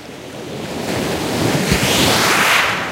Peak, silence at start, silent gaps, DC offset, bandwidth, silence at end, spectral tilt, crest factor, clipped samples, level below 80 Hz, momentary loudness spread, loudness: -2 dBFS; 0 s; none; under 0.1%; 16 kHz; 0 s; -3 dB/octave; 16 dB; under 0.1%; -38 dBFS; 16 LU; -15 LUFS